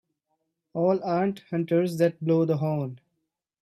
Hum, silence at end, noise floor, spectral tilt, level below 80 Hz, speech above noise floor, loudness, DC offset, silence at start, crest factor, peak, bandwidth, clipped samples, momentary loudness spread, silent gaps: none; 0.65 s; -80 dBFS; -8.5 dB/octave; -72 dBFS; 56 dB; -26 LUFS; under 0.1%; 0.75 s; 16 dB; -10 dBFS; 14 kHz; under 0.1%; 8 LU; none